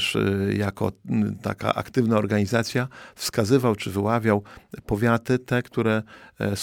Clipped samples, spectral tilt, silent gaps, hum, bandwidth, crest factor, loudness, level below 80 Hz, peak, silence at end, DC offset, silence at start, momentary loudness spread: under 0.1%; -6 dB/octave; none; none; 18 kHz; 18 dB; -24 LUFS; -52 dBFS; -4 dBFS; 0 s; under 0.1%; 0 s; 8 LU